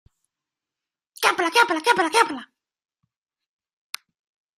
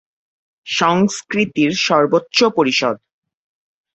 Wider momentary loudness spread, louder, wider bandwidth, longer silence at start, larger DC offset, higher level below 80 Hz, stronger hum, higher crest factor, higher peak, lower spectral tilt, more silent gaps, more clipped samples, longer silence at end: first, 19 LU vs 7 LU; second, -20 LUFS vs -16 LUFS; first, 15.5 kHz vs 8.2 kHz; first, 1.2 s vs 0.65 s; neither; second, -76 dBFS vs -60 dBFS; neither; first, 24 dB vs 16 dB; about the same, -2 dBFS vs -2 dBFS; second, -1 dB/octave vs -4 dB/octave; neither; neither; first, 2.15 s vs 1 s